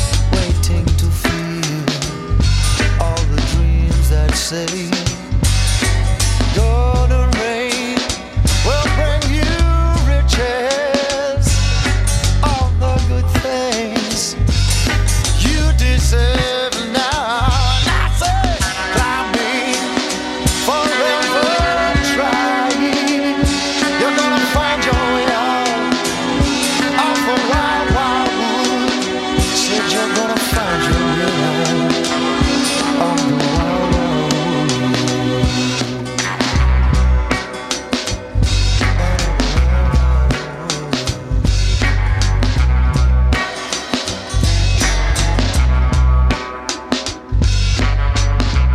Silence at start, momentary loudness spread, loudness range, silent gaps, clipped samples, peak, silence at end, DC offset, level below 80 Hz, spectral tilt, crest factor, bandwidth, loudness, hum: 0 s; 4 LU; 2 LU; none; under 0.1%; 0 dBFS; 0 s; under 0.1%; -18 dBFS; -4.5 dB/octave; 14 dB; 14.5 kHz; -16 LUFS; none